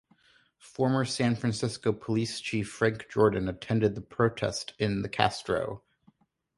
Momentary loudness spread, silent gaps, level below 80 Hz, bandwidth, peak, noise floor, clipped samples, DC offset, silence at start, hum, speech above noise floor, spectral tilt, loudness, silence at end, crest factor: 7 LU; none; -56 dBFS; 11.5 kHz; -4 dBFS; -65 dBFS; under 0.1%; under 0.1%; 0.65 s; none; 37 dB; -5.5 dB/octave; -29 LUFS; 0.8 s; 24 dB